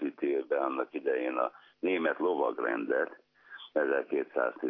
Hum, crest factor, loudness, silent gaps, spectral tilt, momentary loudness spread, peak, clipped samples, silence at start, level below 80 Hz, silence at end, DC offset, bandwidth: none; 18 dB; -32 LUFS; none; -2.5 dB/octave; 6 LU; -14 dBFS; under 0.1%; 0 s; under -90 dBFS; 0 s; under 0.1%; 5.4 kHz